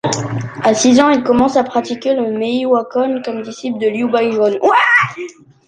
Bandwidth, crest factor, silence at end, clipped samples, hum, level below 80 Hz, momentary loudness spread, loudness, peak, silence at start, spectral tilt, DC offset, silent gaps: 9.8 kHz; 14 dB; 0.35 s; under 0.1%; none; -52 dBFS; 12 LU; -14 LUFS; 0 dBFS; 0.05 s; -4.5 dB/octave; under 0.1%; none